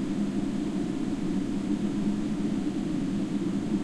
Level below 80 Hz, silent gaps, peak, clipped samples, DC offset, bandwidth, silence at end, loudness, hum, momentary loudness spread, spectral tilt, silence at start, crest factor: -46 dBFS; none; -18 dBFS; under 0.1%; under 0.1%; 11.5 kHz; 0 s; -30 LUFS; none; 1 LU; -7 dB/octave; 0 s; 12 dB